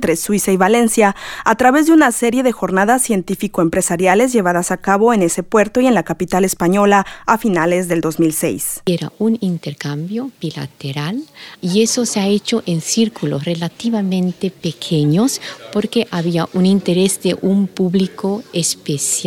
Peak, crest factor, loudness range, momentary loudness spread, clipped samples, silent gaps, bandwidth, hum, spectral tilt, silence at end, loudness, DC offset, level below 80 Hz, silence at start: 0 dBFS; 16 dB; 6 LU; 10 LU; under 0.1%; none; 18 kHz; none; -4.5 dB/octave; 0 s; -16 LUFS; under 0.1%; -50 dBFS; 0 s